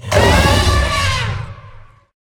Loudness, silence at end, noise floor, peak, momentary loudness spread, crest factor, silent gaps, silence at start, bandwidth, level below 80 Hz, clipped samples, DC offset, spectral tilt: -14 LUFS; 0.5 s; -39 dBFS; 0 dBFS; 14 LU; 16 dB; none; 0.05 s; 19.5 kHz; -22 dBFS; under 0.1%; under 0.1%; -4.5 dB/octave